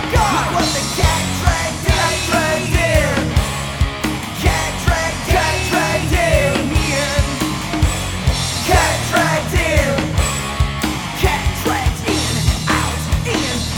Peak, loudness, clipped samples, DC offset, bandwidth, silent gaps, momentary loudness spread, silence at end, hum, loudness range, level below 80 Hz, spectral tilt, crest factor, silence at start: 0 dBFS; -17 LUFS; under 0.1%; under 0.1%; 18.5 kHz; none; 4 LU; 0 s; none; 1 LU; -24 dBFS; -4 dB/octave; 16 dB; 0 s